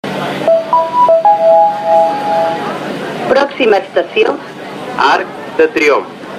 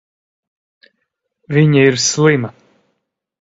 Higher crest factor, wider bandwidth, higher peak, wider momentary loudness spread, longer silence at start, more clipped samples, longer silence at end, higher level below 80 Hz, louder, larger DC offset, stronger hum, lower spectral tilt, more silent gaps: second, 12 dB vs 18 dB; first, 14 kHz vs 8 kHz; about the same, 0 dBFS vs 0 dBFS; first, 12 LU vs 8 LU; second, 0.05 s vs 1.5 s; neither; second, 0 s vs 0.9 s; about the same, -56 dBFS vs -56 dBFS; about the same, -12 LUFS vs -13 LUFS; neither; neither; about the same, -4.5 dB/octave vs -5 dB/octave; neither